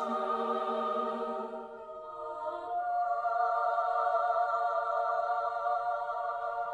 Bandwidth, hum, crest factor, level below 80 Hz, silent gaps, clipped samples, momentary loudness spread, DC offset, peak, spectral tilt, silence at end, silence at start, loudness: 8.2 kHz; none; 14 dB; -74 dBFS; none; under 0.1%; 11 LU; under 0.1%; -18 dBFS; -5 dB/octave; 0 s; 0 s; -32 LUFS